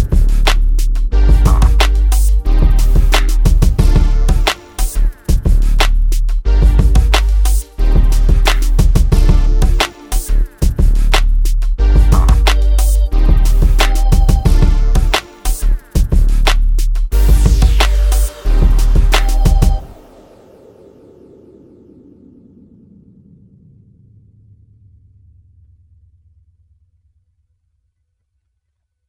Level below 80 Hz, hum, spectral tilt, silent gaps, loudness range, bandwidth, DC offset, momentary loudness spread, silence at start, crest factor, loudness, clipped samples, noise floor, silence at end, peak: -12 dBFS; none; -5 dB/octave; none; 2 LU; 16.5 kHz; under 0.1%; 6 LU; 0 s; 12 dB; -14 LUFS; under 0.1%; -70 dBFS; 9.15 s; 0 dBFS